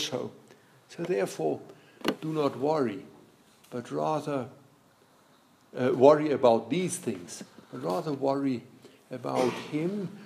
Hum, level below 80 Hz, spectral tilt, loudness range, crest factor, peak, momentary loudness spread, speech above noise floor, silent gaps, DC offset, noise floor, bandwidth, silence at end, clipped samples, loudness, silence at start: none; -80 dBFS; -5.5 dB/octave; 6 LU; 24 dB; -4 dBFS; 19 LU; 33 dB; none; under 0.1%; -61 dBFS; 15.5 kHz; 0 s; under 0.1%; -29 LUFS; 0 s